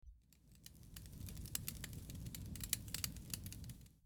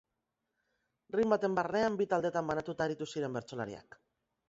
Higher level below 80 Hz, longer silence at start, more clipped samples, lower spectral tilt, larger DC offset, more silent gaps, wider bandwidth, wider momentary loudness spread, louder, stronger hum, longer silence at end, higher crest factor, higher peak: first, -58 dBFS vs -70 dBFS; second, 0.05 s vs 1.15 s; neither; second, -2.5 dB/octave vs -5 dB/octave; neither; neither; first, over 20 kHz vs 7.6 kHz; first, 16 LU vs 11 LU; second, -47 LUFS vs -34 LUFS; neither; second, 0 s vs 0.7 s; first, 32 dB vs 20 dB; second, -18 dBFS vs -14 dBFS